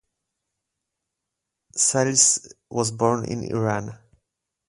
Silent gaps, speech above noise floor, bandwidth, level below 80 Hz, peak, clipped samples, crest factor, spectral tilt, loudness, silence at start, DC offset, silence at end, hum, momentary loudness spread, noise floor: none; 60 dB; 11.5 kHz; -60 dBFS; 0 dBFS; under 0.1%; 24 dB; -3 dB/octave; -21 LUFS; 1.75 s; under 0.1%; 0.75 s; none; 15 LU; -83 dBFS